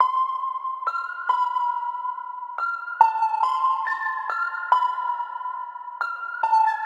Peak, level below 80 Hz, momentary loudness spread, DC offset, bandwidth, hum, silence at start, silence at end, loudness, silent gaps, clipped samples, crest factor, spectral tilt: -2 dBFS; under -90 dBFS; 10 LU; under 0.1%; 9.6 kHz; none; 0 s; 0 s; -24 LUFS; none; under 0.1%; 22 dB; 1 dB/octave